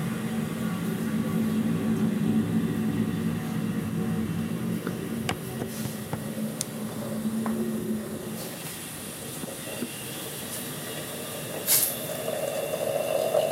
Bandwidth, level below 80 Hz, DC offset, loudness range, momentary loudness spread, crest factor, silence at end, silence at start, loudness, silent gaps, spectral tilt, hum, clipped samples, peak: 16 kHz; -58 dBFS; under 0.1%; 6 LU; 9 LU; 22 dB; 0 s; 0 s; -29 LUFS; none; -5 dB/octave; none; under 0.1%; -6 dBFS